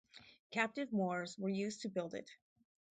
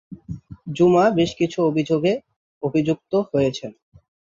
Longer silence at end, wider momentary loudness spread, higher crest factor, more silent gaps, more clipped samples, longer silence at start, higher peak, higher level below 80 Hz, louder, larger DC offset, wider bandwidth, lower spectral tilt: about the same, 0.55 s vs 0.65 s; about the same, 20 LU vs 19 LU; first, 22 dB vs 16 dB; second, 0.39-0.50 s vs 2.36-2.61 s; neither; about the same, 0.15 s vs 0.1 s; second, -20 dBFS vs -4 dBFS; second, -82 dBFS vs -54 dBFS; second, -40 LUFS vs -20 LUFS; neither; first, 9 kHz vs 7.6 kHz; second, -5.5 dB/octave vs -7 dB/octave